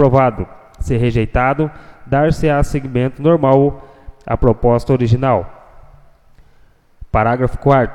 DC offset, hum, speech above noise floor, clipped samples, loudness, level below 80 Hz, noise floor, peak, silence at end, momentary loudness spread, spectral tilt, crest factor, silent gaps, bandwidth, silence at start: under 0.1%; none; 34 dB; under 0.1%; -15 LUFS; -28 dBFS; -48 dBFS; 0 dBFS; 0 s; 11 LU; -8.5 dB/octave; 16 dB; none; 11.5 kHz; 0 s